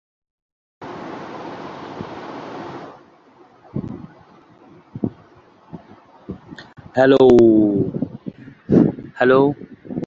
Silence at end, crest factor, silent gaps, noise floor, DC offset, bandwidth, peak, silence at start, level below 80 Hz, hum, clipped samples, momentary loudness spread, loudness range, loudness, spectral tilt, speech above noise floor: 0 s; 18 dB; none; -50 dBFS; under 0.1%; 7.4 kHz; -2 dBFS; 0.8 s; -50 dBFS; none; under 0.1%; 25 LU; 19 LU; -16 LUFS; -8.5 dB/octave; 37 dB